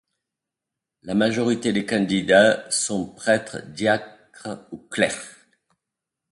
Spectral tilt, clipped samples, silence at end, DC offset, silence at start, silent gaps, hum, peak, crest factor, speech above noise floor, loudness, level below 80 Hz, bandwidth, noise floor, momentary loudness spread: -4 dB/octave; under 0.1%; 1 s; under 0.1%; 1.05 s; none; none; -2 dBFS; 22 dB; 64 dB; -21 LUFS; -60 dBFS; 11.5 kHz; -86 dBFS; 19 LU